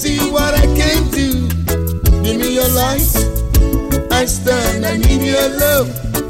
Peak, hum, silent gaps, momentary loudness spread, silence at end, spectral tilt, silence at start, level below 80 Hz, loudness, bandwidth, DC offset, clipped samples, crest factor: -2 dBFS; none; none; 3 LU; 0 s; -4.5 dB/octave; 0 s; -18 dBFS; -14 LUFS; 16.5 kHz; under 0.1%; under 0.1%; 12 dB